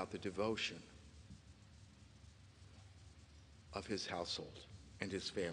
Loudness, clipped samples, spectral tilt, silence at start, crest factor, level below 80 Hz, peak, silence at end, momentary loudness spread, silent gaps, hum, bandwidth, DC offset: -44 LUFS; under 0.1%; -4 dB/octave; 0 s; 24 dB; -66 dBFS; -22 dBFS; 0 s; 21 LU; none; none; 10 kHz; under 0.1%